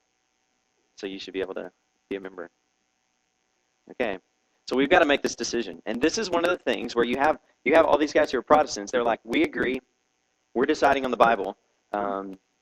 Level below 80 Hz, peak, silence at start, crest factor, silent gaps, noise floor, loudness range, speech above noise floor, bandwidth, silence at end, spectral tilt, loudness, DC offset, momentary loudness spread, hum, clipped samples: -56 dBFS; -4 dBFS; 1 s; 22 dB; none; -73 dBFS; 15 LU; 49 dB; 14 kHz; 0.25 s; -3.5 dB/octave; -24 LUFS; under 0.1%; 16 LU; none; under 0.1%